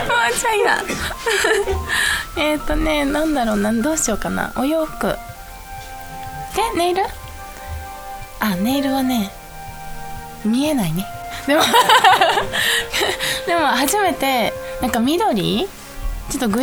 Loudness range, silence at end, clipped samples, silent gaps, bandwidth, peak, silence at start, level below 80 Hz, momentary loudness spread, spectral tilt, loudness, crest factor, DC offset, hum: 8 LU; 0 s; under 0.1%; none; over 20 kHz; 0 dBFS; 0 s; -34 dBFS; 17 LU; -3 dB/octave; -18 LUFS; 20 dB; under 0.1%; none